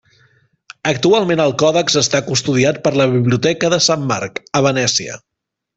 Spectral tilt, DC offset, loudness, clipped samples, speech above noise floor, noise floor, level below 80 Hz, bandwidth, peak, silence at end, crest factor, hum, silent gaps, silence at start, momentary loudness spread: -4 dB/octave; under 0.1%; -15 LUFS; under 0.1%; 41 dB; -56 dBFS; -54 dBFS; 8.4 kHz; -2 dBFS; 0.6 s; 14 dB; none; none; 0.85 s; 7 LU